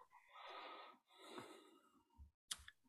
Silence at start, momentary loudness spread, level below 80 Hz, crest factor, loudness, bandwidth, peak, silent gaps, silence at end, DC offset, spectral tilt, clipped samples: 0 s; 17 LU; -76 dBFS; 34 dB; -57 LUFS; 15 kHz; -26 dBFS; 2.34-2.48 s; 0 s; under 0.1%; -1.5 dB/octave; under 0.1%